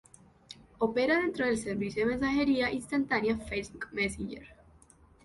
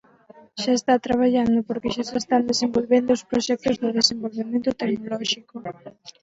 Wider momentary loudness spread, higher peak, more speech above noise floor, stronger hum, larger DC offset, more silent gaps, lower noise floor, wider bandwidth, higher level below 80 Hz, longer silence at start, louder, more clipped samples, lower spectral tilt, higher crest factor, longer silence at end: about the same, 14 LU vs 12 LU; second, -14 dBFS vs -4 dBFS; about the same, 29 dB vs 28 dB; neither; neither; neither; first, -60 dBFS vs -51 dBFS; first, 11.5 kHz vs 8 kHz; about the same, -54 dBFS vs -56 dBFS; about the same, 0.5 s vs 0.55 s; second, -30 LUFS vs -22 LUFS; neither; about the same, -5 dB/octave vs -4 dB/octave; about the same, 18 dB vs 20 dB; first, 0.7 s vs 0.1 s